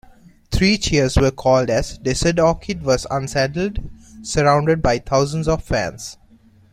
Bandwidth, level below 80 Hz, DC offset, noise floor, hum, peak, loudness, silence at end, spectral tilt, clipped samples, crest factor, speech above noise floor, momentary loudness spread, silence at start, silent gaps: 15 kHz; -32 dBFS; under 0.1%; -50 dBFS; none; -2 dBFS; -19 LUFS; 0.6 s; -5 dB/octave; under 0.1%; 18 dB; 32 dB; 10 LU; 0.5 s; none